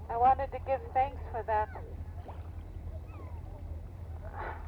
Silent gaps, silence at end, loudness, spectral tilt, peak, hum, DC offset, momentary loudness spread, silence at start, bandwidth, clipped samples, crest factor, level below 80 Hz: none; 0 s; -35 LUFS; -8 dB/octave; -16 dBFS; none; under 0.1%; 17 LU; 0 s; 5.4 kHz; under 0.1%; 18 dB; -44 dBFS